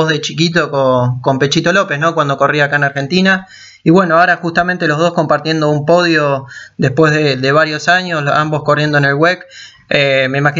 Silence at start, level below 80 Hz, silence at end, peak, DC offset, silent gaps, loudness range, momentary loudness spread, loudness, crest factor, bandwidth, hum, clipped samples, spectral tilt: 0 s; -52 dBFS; 0 s; 0 dBFS; under 0.1%; none; 1 LU; 4 LU; -12 LUFS; 12 dB; 7.8 kHz; none; under 0.1%; -5.5 dB/octave